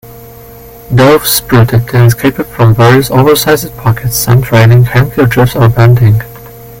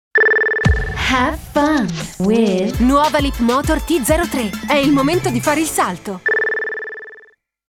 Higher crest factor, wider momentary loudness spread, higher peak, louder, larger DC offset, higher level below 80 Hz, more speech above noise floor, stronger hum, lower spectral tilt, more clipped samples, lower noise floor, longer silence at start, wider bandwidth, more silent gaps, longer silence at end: second, 8 dB vs 14 dB; about the same, 7 LU vs 8 LU; about the same, 0 dBFS vs -2 dBFS; first, -7 LUFS vs -16 LUFS; neither; about the same, -30 dBFS vs -30 dBFS; second, 24 dB vs 32 dB; neither; first, -6 dB/octave vs -4.5 dB/octave; first, 1% vs under 0.1%; second, -31 dBFS vs -48 dBFS; about the same, 0.05 s vs 0.15 s; about the same, 17 kHz vs 18.5 kHz; neither; second, 0 s vs 0.5 s